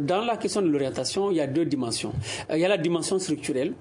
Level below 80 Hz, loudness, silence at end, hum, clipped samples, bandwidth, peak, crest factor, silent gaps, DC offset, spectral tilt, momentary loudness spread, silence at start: -58 dBFS; -26 LUFS; 0 s; none; under 0.1%; 11 kHz; -10 dBFS; 14 dB; none; under 0.1%; -4.5 dB/octave; 5 LU; 0 s